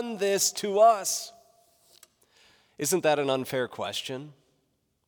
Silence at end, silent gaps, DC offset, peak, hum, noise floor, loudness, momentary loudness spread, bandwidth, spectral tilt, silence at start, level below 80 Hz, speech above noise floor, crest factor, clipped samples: 0.75 s; none; under 0.1%; -10 dBFS; none; -74 dBFS; -26 LUFS; 13 LU; over 20 kHz; -2.5 dB/octave; 0 s; -80 dBFS; 48 dB; 18 dB; under 0.1%